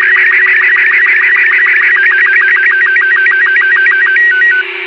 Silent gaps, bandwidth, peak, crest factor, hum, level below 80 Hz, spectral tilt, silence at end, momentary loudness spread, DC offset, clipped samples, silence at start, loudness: none; 6.2 kHz; 0 dBFS; 8 dB; none; -70 dBFS; -1 dB/octave; 0 s; 1 LU; under 0.1%; under 0.1%; 0 s; -6 LUFS